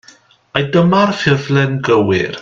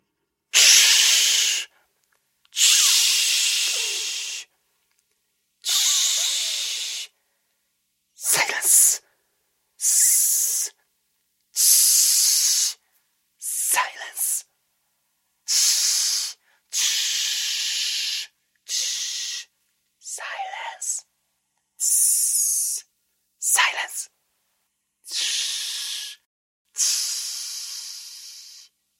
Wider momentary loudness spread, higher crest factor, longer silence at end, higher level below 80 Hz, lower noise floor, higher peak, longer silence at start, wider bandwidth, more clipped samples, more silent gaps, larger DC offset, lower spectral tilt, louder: second, 5 LU vs 18 LU; second, 14 dB vs 24 dB; second, 0 s vs 0.4 s; first, -50 dBFS vs -86 dBFS; second, -47 dBFS vs -76 dBFS; about the same, 0 dBFS vs 0 dBFS; about the same, 0.55 s vs 0.55 s; second, 7.6 kHz vs 16.5 kHz; neither; second, none vs 26.26-26.65 s; neither; first, -6.5 dB/octave vs 5 dB/octave; first, -14 LUFS vs -19 LUFS